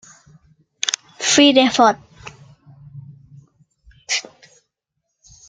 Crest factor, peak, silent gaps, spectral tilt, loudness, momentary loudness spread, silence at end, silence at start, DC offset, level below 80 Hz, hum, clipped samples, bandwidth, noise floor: 20 dB; 0 dBFS; none; -2 dB/octave; -16 LUFS; 28 LU; 1.25 s; 0.85 s; under 0.1%; -60 dBFS; none; under 0.1%; 9.6 kHz; -77 dBFS